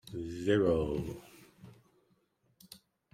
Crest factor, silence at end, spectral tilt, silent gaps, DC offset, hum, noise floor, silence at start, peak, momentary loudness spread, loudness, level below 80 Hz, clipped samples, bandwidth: 20 dB; 0.35 s; -7 dB/octave; none; under 0.1%; none; -73 dBFS; 0.05 s; -16 dBFS; 26 LU; -32 LUFS; -56 dBFS; under 0.1%; 16 kHz